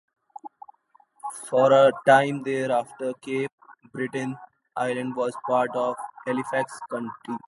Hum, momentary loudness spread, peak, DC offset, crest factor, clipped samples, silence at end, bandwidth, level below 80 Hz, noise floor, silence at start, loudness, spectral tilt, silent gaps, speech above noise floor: none; 20 LU; -4 dBFS; under 0.1%; 22 dB; under 0.1%; 0.1 s; 11.5 kHz; -74 dBFS; -61 dBFS; 0.45 s; -24 LUFS; -5.5 dB/octave; 3.53-3.58 s; 38 dB